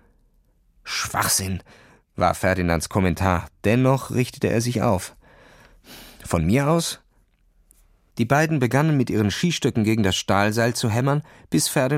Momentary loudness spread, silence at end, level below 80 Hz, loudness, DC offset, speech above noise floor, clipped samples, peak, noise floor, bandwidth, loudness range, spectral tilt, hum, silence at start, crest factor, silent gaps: 9 LU; 0 s; -46 dBFS; -22 LUFS; under 0.1%; 40 dB; under 0.1%; -4 dBFS; -61 dBFS; 16.5 kHz; 4 LU; -5 dB/octave; none; 0.85 s; 20 dB; none